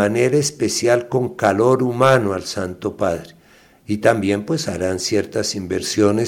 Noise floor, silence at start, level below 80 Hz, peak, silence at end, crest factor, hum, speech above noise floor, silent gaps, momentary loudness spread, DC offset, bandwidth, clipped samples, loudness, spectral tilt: -50 dBFS; 0 s; -54 dBFS; -2 dBFS; 0 s; 16 dB; none; 32 dB; none; 8 LU; under 0.1%; 17 kHz; under 0.1%; -19 LUFS; -5 dB/octave